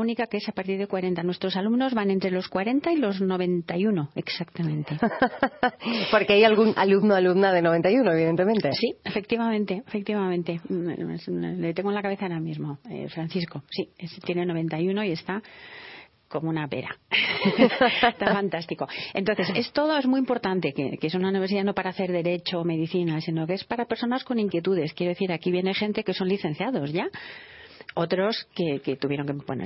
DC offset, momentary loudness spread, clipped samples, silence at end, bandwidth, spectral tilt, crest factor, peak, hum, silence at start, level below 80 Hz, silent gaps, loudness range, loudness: under 0.1%; 11 LU; under 0.1%; 0 s; 5.8 kHz; -9.5 dB/octave; 22 dB; -4 dBFS; none; 0 s; -64 dBFS; none; 9 LU; -25 LUFS